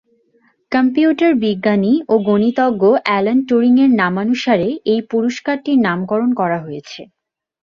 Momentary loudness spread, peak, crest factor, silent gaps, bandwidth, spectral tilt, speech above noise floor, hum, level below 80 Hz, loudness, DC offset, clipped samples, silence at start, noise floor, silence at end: 7 LU; 0 dBFS; 16 dB; none; 7.2 kHz; -7 dB/octave; 44 dB; none; -58 dBFS; -15 LUFS; under 0.1%; under 0.1%; 0.7 s; -58 dBFS; 0.7 s